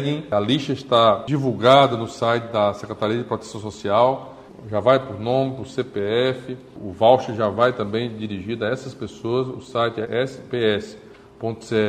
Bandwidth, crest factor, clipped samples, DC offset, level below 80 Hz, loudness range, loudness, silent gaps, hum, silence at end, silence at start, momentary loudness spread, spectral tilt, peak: 11 kHz; 20 dB; under 0.1%; under 0.1%; -56 dBFS; 6 LU; -21 LUFS; none; none; 0 s; 0 s; 14 LU; -6 dB/octave; 0 dBFS